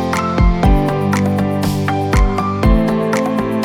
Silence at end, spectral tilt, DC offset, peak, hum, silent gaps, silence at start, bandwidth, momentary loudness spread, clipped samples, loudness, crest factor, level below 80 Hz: 0 s; -7 dB/octave; under 0.1%; 0 dBFS; none; none; 0 s; 16 kHz; 3 LU; under 0.1%; -15 LUFS; 14 dB; -20 dBFS